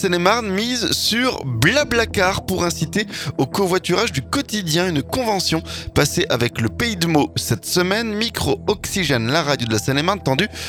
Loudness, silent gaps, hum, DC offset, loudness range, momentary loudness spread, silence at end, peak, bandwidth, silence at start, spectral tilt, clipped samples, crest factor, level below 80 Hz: -19 LUFS; none; none; under 0.1%; 1 LU; 5 LU; 0 s; 0 dBFS; 19 kHz; 0 s; -4 dB/octave; under 0.1%; 20 dB; -40 dBFS